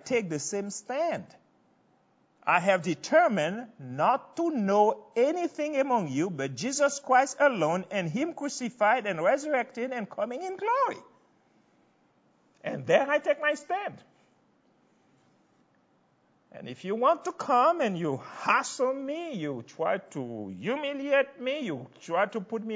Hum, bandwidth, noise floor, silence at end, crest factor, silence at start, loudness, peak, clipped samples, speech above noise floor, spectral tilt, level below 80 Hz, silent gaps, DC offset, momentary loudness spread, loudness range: none; 8 kHz; -67 dBFS; 0 s; 20 dB; 0.05 s; -28 LUFS; -8 dBFS; under 0.1%; 40 dB; -4.5 dB/octave; -80 dBFS; none; under 0.1%; 11 LU; 6 LU